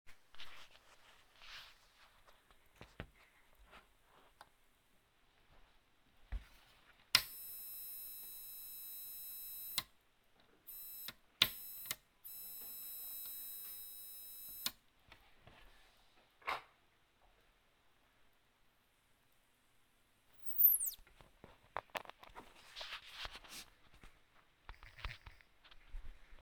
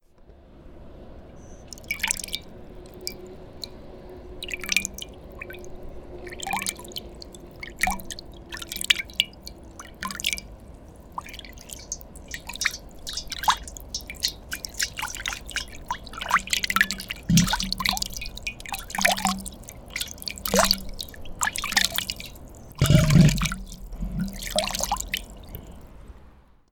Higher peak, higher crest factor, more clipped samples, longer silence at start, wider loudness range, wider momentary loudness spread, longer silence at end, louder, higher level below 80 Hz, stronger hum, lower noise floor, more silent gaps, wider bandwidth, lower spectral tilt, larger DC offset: second, -10 dBFS vs -2 dBFS; first, 38 dB vs 26 dB; neither; second, 0.05 s vs 0.2 s; first, 23 LU vs 10 LU; first, 25 LU vs 22 LU; second, 0 s vs 0.3 s; second, -40 LUFS vs -26 LUFS; second, -62 dBFS vs -40 dBFS; neither; first, -74 dBFS vs -51 dBFS; neither; about the same, over 20 kHz vs 19 kHz; second, 0 dB/octave vs -3.5 dB/octave; neither